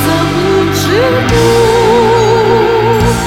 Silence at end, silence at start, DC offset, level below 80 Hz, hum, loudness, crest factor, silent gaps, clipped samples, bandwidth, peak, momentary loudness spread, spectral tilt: 0 s; 0 s; under 0.1%; -26 dBFS; none; -9 LUFS; 8 dB; none; under 0.1%; 17 kHz; 0 dBFS; 3 LU; -5.5 dB/octave